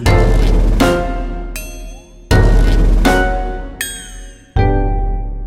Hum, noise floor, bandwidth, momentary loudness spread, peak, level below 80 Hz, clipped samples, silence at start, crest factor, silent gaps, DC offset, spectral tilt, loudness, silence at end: none; -32 dBFS; 15.5 kHz; 16 LU; 0 dBFS; -14 dBFS; under 0.1%; 0 s; 12 dB; none; under 0.1%; -6 dB/octave; -16 LUFS; 0 s